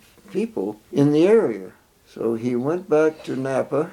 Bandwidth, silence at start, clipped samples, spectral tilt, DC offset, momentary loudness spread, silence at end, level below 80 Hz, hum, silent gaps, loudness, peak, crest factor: 12.5 kHz; 0.3 s; under 0.1%; -7.5 dB/octave; under 0.1%; 12 LU; 0 s; -64 dBFS; none; none; -21 LUFS; -6 dBFS; 16 dB